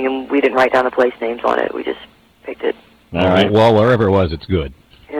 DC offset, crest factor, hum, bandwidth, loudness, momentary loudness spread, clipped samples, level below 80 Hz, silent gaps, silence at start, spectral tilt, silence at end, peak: under 0.1%; 12 dB; none; 12.5 kHz; -16 LUFS; 17 LU; under 0.1%; -40 dBFS; none; 0 s; -7 dB/octave; 0 s; -4 dBFS